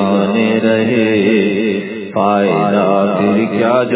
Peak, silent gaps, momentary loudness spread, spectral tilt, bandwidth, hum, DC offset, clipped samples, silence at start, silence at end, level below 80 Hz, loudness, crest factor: 0 dBFS; none; 4 LU; -10.5 dB/octave; 4 kHz; none; under 0.1%; under 0.1%; 0 s; 0 s; -54 dBFS; -13 LUFS; 12 dB